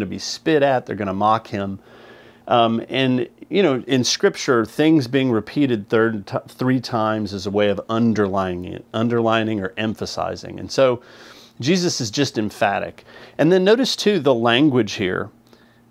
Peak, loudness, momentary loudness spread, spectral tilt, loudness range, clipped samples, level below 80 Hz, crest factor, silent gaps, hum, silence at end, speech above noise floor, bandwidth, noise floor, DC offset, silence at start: -2 dBFS; -20 LUFS; 11 LU; -5 dB/octave; 3 LU; under 0.1%; -60 dBFS; 18 dB; none; none; 0.6 s; 32 dB; 15 kHz; -51 dBFS; under 0.1%; 0 s